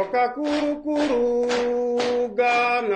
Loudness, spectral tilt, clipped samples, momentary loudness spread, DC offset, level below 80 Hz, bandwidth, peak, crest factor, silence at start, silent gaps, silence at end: -22 LUFS; -4 dB/octave; under 0.1%; 4 LU; under 0.1%; -54 dBFS; 9.8 kHz; -10 dBFS; 12 dB; 0 s; none; 0 s